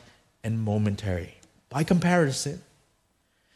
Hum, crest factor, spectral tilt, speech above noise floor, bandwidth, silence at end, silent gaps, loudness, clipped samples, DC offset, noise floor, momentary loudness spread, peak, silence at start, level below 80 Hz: none; 20 dB; -6 dB/octave; 44 dB; 13.5 kHz; 0.95 s; none; -27 LUFS; under 0.1%; under 0.1%; -70 dBFS; 15 LU; -8 dBFS; 0.45 s; -54 dBFS